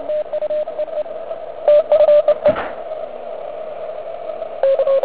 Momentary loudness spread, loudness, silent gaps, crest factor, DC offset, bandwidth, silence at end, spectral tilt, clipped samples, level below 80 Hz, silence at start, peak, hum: 17 LU; -18 LUFS; none; 16 dB; 1%; 4 kHz; 0 s; -8 dB/octave; under 0.1%; -56 dBFS; 0 s; -2 dBFS; none